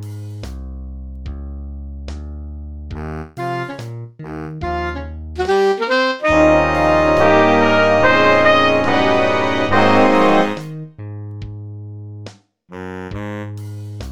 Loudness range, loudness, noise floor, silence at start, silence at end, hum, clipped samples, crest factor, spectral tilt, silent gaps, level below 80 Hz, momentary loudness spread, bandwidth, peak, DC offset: 17 LU; -14 LUFS; -39 dBFS; 0 s; 0 s; none; under 0.1%; 16 dB; -6 dB/octave; none; -34 dBFS; 20 LU; 12.5 kHz; 0 dBFS; under 0.1%